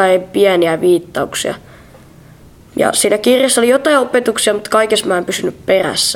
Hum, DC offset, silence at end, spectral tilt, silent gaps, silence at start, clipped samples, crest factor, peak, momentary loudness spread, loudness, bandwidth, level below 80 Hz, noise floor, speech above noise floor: none; under 0.1%; 0 s; -3 dB/octave; none; 0 s; under 0.1%; 14 dB; 0 dBFS; 8 LU; -13 LUFS; 17 kHz; -50 dBFS; -41 dBFS; 27 dB